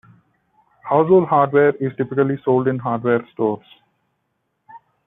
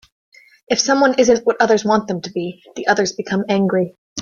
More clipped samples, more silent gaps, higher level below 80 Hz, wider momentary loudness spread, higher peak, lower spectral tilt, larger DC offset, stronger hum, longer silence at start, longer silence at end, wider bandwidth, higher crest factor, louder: neither; second, none vs 3.98-4.16 s; second, -64 dBFS vs -58 dBFS; about the same, 9 LU vs 11 LU; about the same, -2 dBFS vs 0 dBFS; first, -11.5 dB/octave vs -4 dB/octave; neither; neither; first, 0.85 s vs 0.7 s; first, 0.3 s vs 0 s; second, 3.9 kHz vs 7.4 kHz; about the same, 16 dB vs 18 dB; about the same, -18 LUFS vs -17 LUFS